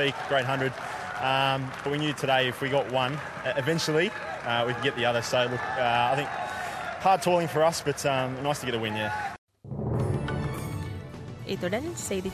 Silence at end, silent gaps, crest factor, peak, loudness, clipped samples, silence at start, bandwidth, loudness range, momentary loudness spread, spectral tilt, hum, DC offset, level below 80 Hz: 0 s; 9.38-9.48 s; 18 dB; -10 dBFS; -28 LUFS; under 0.1%; 0 s; 14.5 kHz; 5 LU; 10 LU; -4.5 dB/octave; none; under 0.1%; -50 dBFS